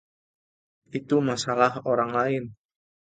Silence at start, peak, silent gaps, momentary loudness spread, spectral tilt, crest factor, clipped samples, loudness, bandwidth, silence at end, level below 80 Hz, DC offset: 0.95 s; -8 dBFS; none; 13 LU; -5.5 dB/octave; 20 dB; under 0.1%; -25 LUFS; 9.4 kHz; 0.6 s; -66 dBFS; under 0.1%